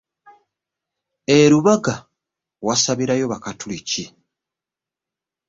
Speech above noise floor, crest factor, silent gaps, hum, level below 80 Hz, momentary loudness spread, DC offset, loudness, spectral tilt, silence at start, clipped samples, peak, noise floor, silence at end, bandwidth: 70 dB; 20 dB; none; none; -58 dBFS; 17 LU; under 0.1%; -18 LUFS; -4.5 dB/octave; 1.3 s; under 0.1%; -2 dBFS; -88 dBFS; 1.4 s; 7.8 kHz